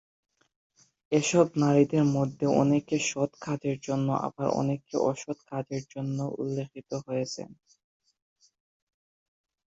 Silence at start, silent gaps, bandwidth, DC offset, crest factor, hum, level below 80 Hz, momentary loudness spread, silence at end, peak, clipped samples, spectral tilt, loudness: 1.1 s; none; 8 kHz; under 0.1%; 22 dB; none; -68 dBFS; 13 LU; 2.2 s; -8 dBFS; under 0.1%; -6 dB/octave; -28 LUFS